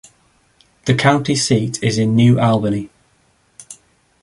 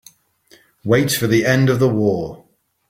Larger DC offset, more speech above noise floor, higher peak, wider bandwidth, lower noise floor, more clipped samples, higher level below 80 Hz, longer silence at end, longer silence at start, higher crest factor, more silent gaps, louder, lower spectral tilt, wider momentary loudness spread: neither; first, 44 dB vs 37 dB; about the same, -2 dBFS vs -2 dBFS; second, 11.5 kHz vs 16.5 kHz; first, -58 dBFS vs -53 dBFS; neither; about the same, -50 dBFS vs -52 dBFS; about the same, 0.5 s vs 0.55 s; about the same, 0.85 s vs 0.85 s; about the same, 16 dB vs 18 dB; neither; about the same, -16 LUFS vs -17 LUFS; about the same, -5.5 dB/octave vs -5.5 dB/octave; first, 18 LU vs 12 LU